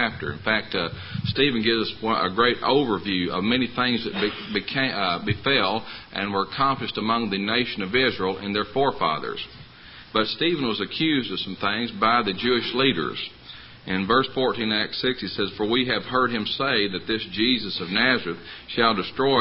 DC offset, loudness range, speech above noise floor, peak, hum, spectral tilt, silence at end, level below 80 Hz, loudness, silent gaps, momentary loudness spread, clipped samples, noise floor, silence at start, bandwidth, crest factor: under 0.1%; 2 LU; 21 dB; -2 dBFS; none; -9.5 dB/octave; 0 s; -52 dBFS; -23 LUFS; none; 9 LU; under 0.1%; -45 dBFS; 0 s; 5.8 kHz; 22 dB